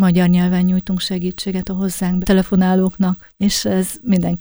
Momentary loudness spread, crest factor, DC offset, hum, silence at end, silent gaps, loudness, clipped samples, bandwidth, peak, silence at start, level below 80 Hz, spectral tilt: 7 LU; 14 dB; under 0.1%; none; 0 s; none; -17 LUFS; under 0.1%; over 20 kHz; -2 dBFS; 0 s; -38 dBFS; -6 dB/octave